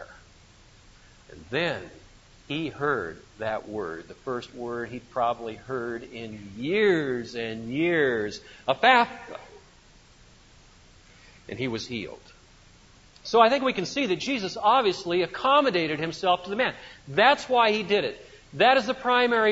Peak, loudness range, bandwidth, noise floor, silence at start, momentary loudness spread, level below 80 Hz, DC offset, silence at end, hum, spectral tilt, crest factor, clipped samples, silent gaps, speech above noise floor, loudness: -4 dBFS; 9 LU; 8 kHz; -54 dBFS; 0 s; 16 LU; -58 dBFS; under 0.1%; 0 s; none; -4.5 dB/octave; 22 dB; under 0.1%; none; 29 dB; -25 LUFS